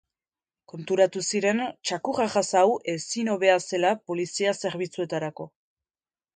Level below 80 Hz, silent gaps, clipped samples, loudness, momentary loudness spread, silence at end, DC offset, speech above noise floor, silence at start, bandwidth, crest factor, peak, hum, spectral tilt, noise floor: -72 dBFS; none; under 0.1%; -25 LUFS; 10 LU; 0.85 s; under 0.1%; over 65 dB; 0.75 s; 9.6 kHz; 20 dB; -6 dBFS; none; -3.5 dB/octave; under -90 dBFS